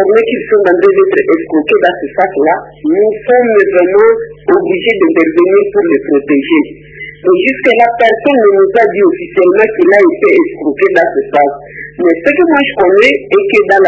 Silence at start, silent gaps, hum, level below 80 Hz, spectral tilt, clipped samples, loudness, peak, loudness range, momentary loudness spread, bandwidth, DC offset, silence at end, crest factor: 0 s; none; none; -48 dBFS; -6.5 dB/octave; 0.5%; -9 LUFS; 0 dBFS; 2 LU; 6 LU; 8 kHz; under 0.1%; 0 s; 8 dB